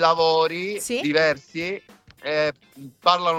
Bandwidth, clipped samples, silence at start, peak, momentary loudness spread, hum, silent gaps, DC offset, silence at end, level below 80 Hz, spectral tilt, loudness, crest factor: 15.5 kHz; under 0.1%; 0 s; -2 dBFS; 12 LU; none; none; under 0.1%; 0 s; -64 dBFS; -3.5 dB/octave; -22 LUFS; 20 dB